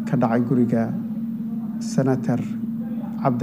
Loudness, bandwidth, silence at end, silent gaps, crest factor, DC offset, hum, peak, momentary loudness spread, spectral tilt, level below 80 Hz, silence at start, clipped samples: -23 LUFS; 15.5 kHz; 0 s; none; 16 dB; under 0.1%; none; -6 dBFS; 8 LU; -8 dB/octave; -58 dBFS; 0 s; under 0.1%